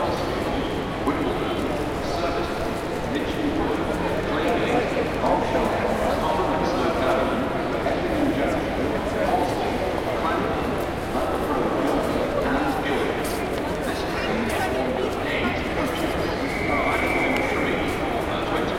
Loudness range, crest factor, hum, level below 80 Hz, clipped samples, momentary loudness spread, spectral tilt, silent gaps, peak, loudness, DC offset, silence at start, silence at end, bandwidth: 2 LU; 16 dB; none; -38 dBFS; under 0.1%; 4 LU; -5.5 dB/octave; none; -8 dBFS; -24 LUFS; under 0.1%; 0 s; 0 s; 16.5 kHz